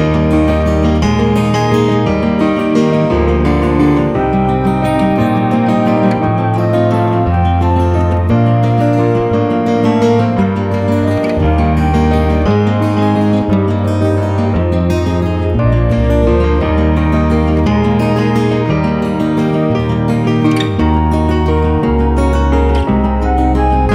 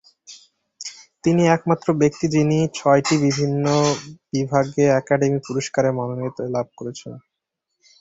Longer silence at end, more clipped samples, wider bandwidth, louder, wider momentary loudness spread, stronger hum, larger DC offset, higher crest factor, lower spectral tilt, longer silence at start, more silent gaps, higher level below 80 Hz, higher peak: second, 0 s vs 0.8 s; neither; first, 11 kHz vs 8 kHz; first, -13 LUFS vs -20 LUFS; second, 2 LU vs 15 LU; neither; first, 0.3% vs under 0.1%; second, 12 dB vs 18 dB; first, -8 dB/octave vs -6 dB/octave; second, 0 s vs 0.3 s; neither; first, -20 dBFS vs -56 dBFS; about the same, 0 dBFS vs -2 dBFS